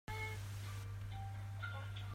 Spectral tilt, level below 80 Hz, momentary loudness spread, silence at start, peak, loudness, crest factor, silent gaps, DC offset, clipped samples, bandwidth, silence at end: -5 dB/octave; -58 dBFS; 3 LU; 0.1 s; -32 dBFS; -47 LUFS; 12 dB; none; under 0.1%; under 0.1%; 16 kHz; 0 s